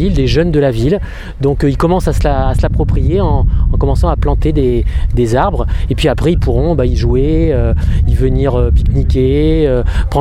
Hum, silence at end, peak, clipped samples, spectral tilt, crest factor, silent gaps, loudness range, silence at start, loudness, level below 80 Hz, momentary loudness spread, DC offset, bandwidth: none; 0 s; 0 dBFS; under 0.1%; -8 dB/octave; 10 dB; none; 1 LU; 0 s; -13 LUFS; -14 dBFS; 3 LU; under 0.1%; 12 kHz